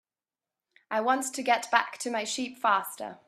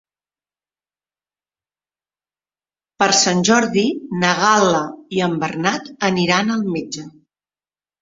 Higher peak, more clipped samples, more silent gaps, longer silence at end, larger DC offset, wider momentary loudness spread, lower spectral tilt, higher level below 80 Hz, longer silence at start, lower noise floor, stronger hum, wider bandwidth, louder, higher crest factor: second, -6 dBFS vs -2 dBFS; neither; neither; second, 0.1 s vs 0.95 s; neither; about the same, 8 LU vs 9 LU; second, -1.5 dB/octave vs -3.5 dB/octave; second, -82 dBFS vs -60 dBFS; second, 0.9 s vs 3 s; about the same, under -90 dBFS vs under -90 dBFS; neither; first, 14.5 kHz vs 8 kHz; second, -28 LUFS vs -17 LUFS; first, 24 dB vs 18 dB